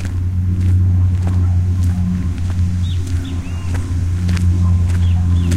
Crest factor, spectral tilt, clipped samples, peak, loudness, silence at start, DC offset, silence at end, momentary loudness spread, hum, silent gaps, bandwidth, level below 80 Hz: 12 dB; -7.5 dB/octave; under 0.1%; -2 dBFS; -17 LUFS; 0 s; under 0.1%; 0 s; 6 LU; none; none; 9.6 kHz; -26 dBFS